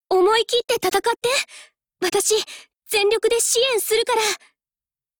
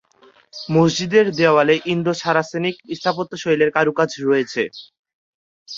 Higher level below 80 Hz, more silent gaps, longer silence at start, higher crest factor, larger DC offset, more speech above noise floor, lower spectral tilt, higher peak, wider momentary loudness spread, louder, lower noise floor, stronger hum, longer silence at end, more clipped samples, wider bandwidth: about the same, -58 dBFS vs -60 dBFS; second, none vs 4.99-5.03 s, 5.14-5.66 s; second, 0.1 s vs 0.55 s; about the same, 14 dB vs 18 dB; neither; first, over 70 dB vs 35 dB; second, -0.5 dB/octave vs -5.5 dB/octave; second, -8 dBFS vs -2 dBFS; about the same, 9 LU vs 9 LU; about the same, -19 LUFS vs -18 LUFS; first, under -90 dBFS vs -53 dBFS; neither; first, 0.85 s vs 0 s; neither; first, over 20 kHz vs 7.6 kHz